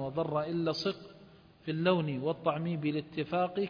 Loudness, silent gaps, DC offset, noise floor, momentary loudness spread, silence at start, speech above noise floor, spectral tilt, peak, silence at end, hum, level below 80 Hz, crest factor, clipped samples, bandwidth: -33 LUFS; none; under 0.1%; -57 dBFS; 9 LU; 0 s; 25 dB; -7.5 dB/octave; -14 dBFS; 0 s; none; -68 dBFS; 18 dB; under 0.1%; 5.2 kHz